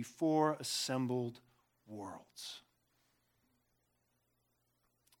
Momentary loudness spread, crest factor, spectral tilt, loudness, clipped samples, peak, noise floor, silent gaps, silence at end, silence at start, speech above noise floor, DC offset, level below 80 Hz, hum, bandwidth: 17 LU; 22 dB; -4.5 dB/octave; -36 LUFS; under 0.1%; -20 dBFS; -80 dBFS; none; 2.6 s; 0 s; 43 dB; under 0.1%; -86 dBFS; 60 Hz at -75 dBFS; 18 kHz